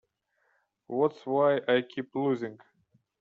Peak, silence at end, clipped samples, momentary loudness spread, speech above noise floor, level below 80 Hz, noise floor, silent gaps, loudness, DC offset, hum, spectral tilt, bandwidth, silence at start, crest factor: -12 dBFS; 0.65 s; under 0.1%; 10 LU; 46 dB; -76 dBFS; -74 dBFS; none; -29 LUFS; under 0.1%; none; -4.5 dB/octave; 7 kHz; 0.9 s; 18 dB